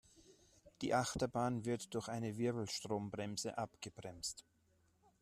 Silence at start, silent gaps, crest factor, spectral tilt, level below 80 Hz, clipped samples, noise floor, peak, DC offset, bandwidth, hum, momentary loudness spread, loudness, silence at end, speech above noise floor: 0.15 s; none; 20 dB; -4.5 dB/octave; -70 dBFS; under 0.1%; -75 dBFS; -22 dBFS; under 0.1%; 14 kHz; none; 9 LU; -41 LUFS; 0.8 s; 34 dB